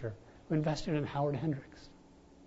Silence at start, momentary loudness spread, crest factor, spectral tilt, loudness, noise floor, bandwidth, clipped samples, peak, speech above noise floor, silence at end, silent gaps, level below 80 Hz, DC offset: 0 s; 20 LU; 16 dB; -7 dB/octave; -35 LUFS; -59 dBFS; 7.6 kHz; under 0.1%; -20 dBFS; 25 dB; 0 s; none; -58 dBFS; under 0.1%